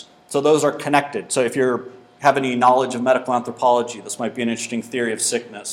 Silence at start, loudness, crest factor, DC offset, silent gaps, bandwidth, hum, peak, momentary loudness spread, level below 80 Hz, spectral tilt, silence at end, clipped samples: 0.3 s; -20 LUFS; 20 dB; under 0.1%; none; 17 kHz; none; 0 dBFS; 9 LU; -70 dBFS; -3.5 dB/octave; 0 s; under 0.1%